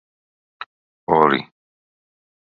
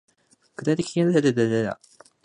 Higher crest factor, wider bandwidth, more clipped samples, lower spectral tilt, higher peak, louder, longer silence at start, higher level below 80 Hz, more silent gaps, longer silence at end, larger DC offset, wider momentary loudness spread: first, 24 dB vs 16 dB; second, 5.2 kHz vs 10.5 kHz; neither; first, -8 dB/octave vs -6.5 dB/octave; first, 0 dBFS vs -8 dBFS; first, -18 LUFS vs -23 LUFS; about the same, 0.6 s vs 0.6 s; about the same, -60 dBFS vs -64 dBFS; first, 0.66-1.07 s vs none; first, 1.1 s vs 0.5 s; neither; first, 22 LU vs 15 LU